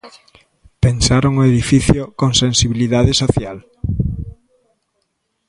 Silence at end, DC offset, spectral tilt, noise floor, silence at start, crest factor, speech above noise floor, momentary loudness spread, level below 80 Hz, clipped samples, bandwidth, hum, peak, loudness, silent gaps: 1.15 s; under 0.1%; -5 dB/octave; -69 dBFS; 0.05 s; 16 dB; 55 dB; 12 LU; -30 dBFS; under 0.1%; 11.5 kHz; none; 0 dBFS; -15 LUFS; none